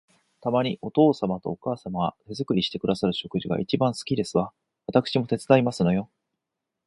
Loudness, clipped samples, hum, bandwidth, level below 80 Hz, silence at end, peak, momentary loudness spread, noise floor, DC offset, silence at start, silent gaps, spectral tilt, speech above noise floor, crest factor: -25 LUFS; under 0.1%; none; 11.5 kHz; -58 dBFS; 0.8 s; -4 dBFS; 10 LU; -84 dBFS; under 0.1%; 0.45 s; none; -6.5 dB/octave; 60 dB; 22 dB